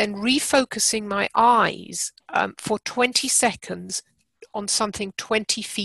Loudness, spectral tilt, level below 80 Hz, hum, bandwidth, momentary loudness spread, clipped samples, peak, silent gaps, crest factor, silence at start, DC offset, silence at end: -22 LUFS; -2 dB/octave; -58 dBFS; none; 13.5 kHz; 12 LU; under 0.1%; -4 dBFS; none; 20 dB; 0 s; under 0.1%; 0 s